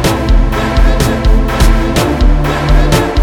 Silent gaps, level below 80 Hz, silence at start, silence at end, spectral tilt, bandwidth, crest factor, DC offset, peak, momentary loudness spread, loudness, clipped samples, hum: none; -10 dBFS; 0 s; 0 s; -5.5 dB/octave; 16.5 kHz; 8 dB; under 0.1%; 0 dBFS; 2 LU; -12 LUFS; under 0.1%; none